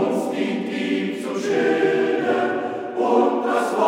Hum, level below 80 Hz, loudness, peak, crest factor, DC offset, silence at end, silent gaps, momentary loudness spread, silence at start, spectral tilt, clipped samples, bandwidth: none; -70 dBFS; -21 LUFS; -6 dBFS; 14 dB; under 0.1%; 0 s; none; 7 LU; 0 s; -5.5 dB/octave; under 0.1%; 16 kHz